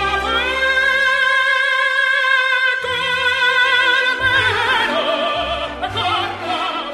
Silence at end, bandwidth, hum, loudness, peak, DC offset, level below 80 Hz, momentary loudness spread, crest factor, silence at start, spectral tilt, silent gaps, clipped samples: 0 s; 13 kHz; none; -15 LUFS; -2 dBFS; under 0.1%; -42 dBFS; 7 LU; 14 dB; 0 s; -2.5 dB/octave; none; under 0.1%